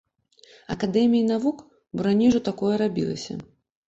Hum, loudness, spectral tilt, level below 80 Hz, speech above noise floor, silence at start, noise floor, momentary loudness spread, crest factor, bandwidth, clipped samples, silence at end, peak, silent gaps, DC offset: none; -23 LUFS; -6.5 dB/octave; -56 dBFS; 34 dB; 0.7 s; -56 dBFS; 16 LU; 14 dB; 8 kHz; under 0.1%; 0.45 s; -10 dBFS; none; under 0.1%